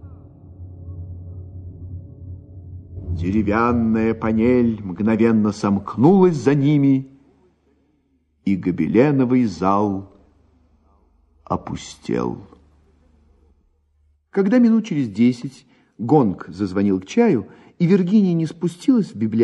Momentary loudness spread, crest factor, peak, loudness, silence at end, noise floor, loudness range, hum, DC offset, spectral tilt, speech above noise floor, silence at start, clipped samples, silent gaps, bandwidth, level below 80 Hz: 21 LU; 18 dB; 0 dBFS; -19 LUFS; 0 s; -64 dBFS; 13 LU; none; under 0.1%; -8 dB/octave; 46 dB; 0.05 s; under 0.1%; none; 9.2 kHz; -44 dBFS